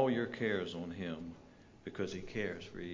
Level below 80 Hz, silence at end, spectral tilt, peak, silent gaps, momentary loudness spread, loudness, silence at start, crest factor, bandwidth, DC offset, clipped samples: -62 dBFS; 0 s; -6 dB/octave; -18 dBFS; none; 15 LU; -39 LUFS; 0 s; 20 dB; 7.6 kHz; under 0.1%; under 0.1%